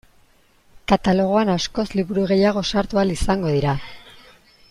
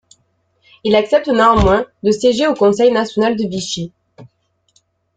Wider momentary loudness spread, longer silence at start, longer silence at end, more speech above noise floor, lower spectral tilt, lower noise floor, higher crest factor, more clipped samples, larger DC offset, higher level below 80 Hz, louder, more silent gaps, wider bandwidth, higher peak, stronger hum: second, 6 LU vs 11 LU; about the same, 0.9 s vs 0.85 s; second, 0.7 s vs 0.9 s; second, 37 dB vs 48 dB; about the same, -6 dB/octave vs -5 dB/octave; second, -56 dBFS vs -62 dBFS; about the same, 18 dB vs 14 dB; neither; neither; about the same, -38 dBFS vs -34 dBFS; second, -20 LUFS vs -14 LUFS; neither; first, 12 kHz vs 9.4 kHz; about the same, -4 dBFS vs -2 dBFS; neither